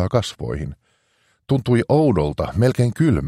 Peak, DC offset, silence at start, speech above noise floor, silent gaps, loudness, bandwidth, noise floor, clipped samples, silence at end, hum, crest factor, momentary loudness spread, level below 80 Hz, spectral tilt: -4 dBFS; under 0.1%; 0 s; 45 dB; none; -20 LUFS; 13 kHz; -64 dBFS; under 0.1%; 0 s; none; 14 dB; 11 LU; -38 dBFS; -7.5 dB/octave